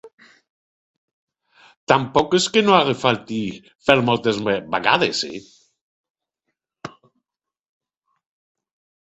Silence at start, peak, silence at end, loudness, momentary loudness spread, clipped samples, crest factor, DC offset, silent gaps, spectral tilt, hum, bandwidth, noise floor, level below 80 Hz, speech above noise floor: 0.05 s; 0 dBFS; 2.15 s; -19 LUFS; 22 LU; under 0.1%; 22 dB; under 0.1%; 0.13-0.18 s, 0.50-1.27 s, 1.77-1.87 s, 5.81-6.04 s, 6.10-6.15 s; -4 dB/octave; none; 8.2 kHz; -88 dBFS; -58 dBFS; 69 dB